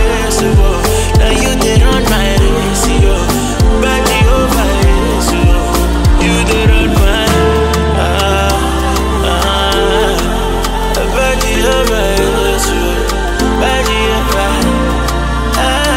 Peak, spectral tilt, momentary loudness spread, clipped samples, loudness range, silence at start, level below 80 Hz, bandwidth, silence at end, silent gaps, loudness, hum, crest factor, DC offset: 0 dBFS; -4.5 dB/octave; 4 LU; under 0.1%; 2 LU; 0 s; -14 dBFS; 16.5 kHz; 0 s; none; -12 LUFS; none; 10 dB; under 0.1%